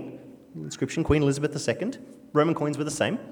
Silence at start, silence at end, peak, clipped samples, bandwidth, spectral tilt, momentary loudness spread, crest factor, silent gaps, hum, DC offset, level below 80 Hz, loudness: 0 s; 0 s; -8 dBFS; under 0.1%; 17 kHz; -5.5 dB/octave; 19 LU; 20 dB; none; none; under 0.1%; -48 dBFS; -26 LUFS